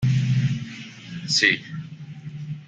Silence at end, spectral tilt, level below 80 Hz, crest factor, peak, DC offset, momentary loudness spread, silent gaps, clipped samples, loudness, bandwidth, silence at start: 0 s; -4 dB/octave; -56 dBFS; 20 dB; -4 dBFS; under 0.1%; 20 LU; none; under 0.1%; -21 LUFS; 9.2 kHz; 0 s